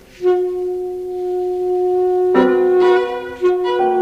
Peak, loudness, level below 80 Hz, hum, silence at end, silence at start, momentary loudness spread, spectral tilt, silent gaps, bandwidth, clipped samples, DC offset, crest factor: 0 dBFS; -17 LUFS; -52 dBFS; none; 0 s; 0.2 s; 10 LU; -6.5 dB/octave; none; 6.2 kHz; under 0.1%; under 0.1%; 16 dB